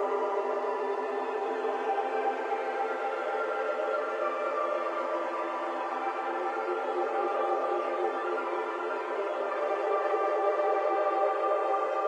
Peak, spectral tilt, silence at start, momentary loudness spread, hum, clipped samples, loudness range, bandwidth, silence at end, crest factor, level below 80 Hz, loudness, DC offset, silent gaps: -16 dBFS; -2.5 dB/octave; 0 s; 5 LU; none; under 0.1%; 2 LU; 10 kHz; 0 s; 14 dB; under -90 dBFS; -30 LUFS; under 0.1%; none